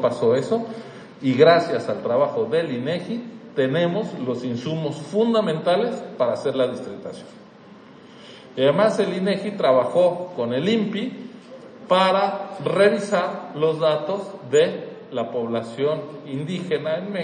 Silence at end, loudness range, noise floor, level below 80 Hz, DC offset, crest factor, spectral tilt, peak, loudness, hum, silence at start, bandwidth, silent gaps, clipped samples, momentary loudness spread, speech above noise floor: 0 s; 3 LU; -45 dBFS; -74 dBFS; under 0.1%; 20 dB; -6 dB/octave; -2 dBFS; -22 LUFS; none; 0 s; 9.8 kHz; none; under 0.1%; 14 LU; 24 dB